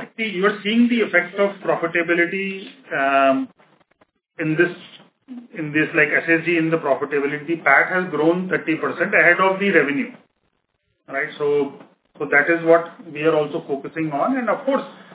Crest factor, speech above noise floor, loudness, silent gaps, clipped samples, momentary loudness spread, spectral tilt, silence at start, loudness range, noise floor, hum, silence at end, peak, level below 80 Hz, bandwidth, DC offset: 20 dB; 51 dB; -19 LUFS; none; under 0.1%; 12 LU; -9 dB/octave; 0 s; 4 LU; -71 dBFS; none; 0 s; -2 dBFS; -74 dBFS; 4 kHz; under 0.1%